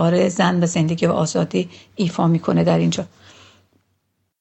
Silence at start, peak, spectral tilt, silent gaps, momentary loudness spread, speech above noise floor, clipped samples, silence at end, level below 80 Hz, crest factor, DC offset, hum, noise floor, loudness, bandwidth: 0 s; -2 dBFS; -6 dB/octave; none; 8 LU; 51 dB; under 0.1%; 1.35 s; -56 dBFS; 18 dB; under 0.1%; none; -70 dBFS; -19 LUFS; 8.4 kHz